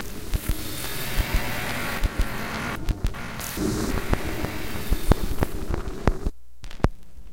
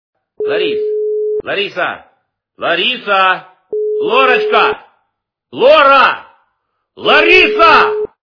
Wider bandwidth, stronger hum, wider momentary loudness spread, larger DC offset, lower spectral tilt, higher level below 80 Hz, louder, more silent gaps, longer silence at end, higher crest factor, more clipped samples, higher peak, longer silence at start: first, 17 kHz vs 5.4 kHz; neither; second, 6 LU vs 15 LU; first, 2% vs under 0.1%; about the same, -5 dB/octave vs -4 dB/octave; first, -28 dBFS vs -48 dBFS; second, -28 LUFS vs -11 LUFS; neither; second, 0 s vs 0.2 s; first, 26 dB vs 12 dB; second, under 0.1% vs 0.4%; about the same, 0 dBFS vs 0 dBFS; second, 0 s vs 0.4 s